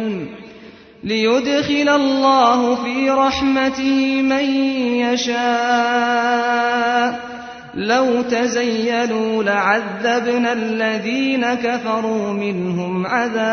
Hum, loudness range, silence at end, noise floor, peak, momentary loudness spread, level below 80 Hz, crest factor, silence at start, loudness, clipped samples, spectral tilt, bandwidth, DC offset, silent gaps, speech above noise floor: none; 3 LU; 0 s; -41 dBFS; -2 dBFS; 7 LU; -52 dBFS; 16 dB; 0 s; -17 LUFS; under 0.1%; -4.5 dB/octave; 6.6 kHz; under 0.1%; none; 24 dB